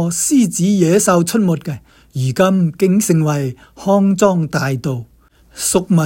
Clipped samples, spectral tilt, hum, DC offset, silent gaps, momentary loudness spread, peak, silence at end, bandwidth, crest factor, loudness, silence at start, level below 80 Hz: under 0.1%; -5.5 dB/octave; none; under 0.1%; none; 12 LU; 0 dBFS; 0 s; 17 kHz; 14 dB; -15 LUFS; 0 s; -48 dBFS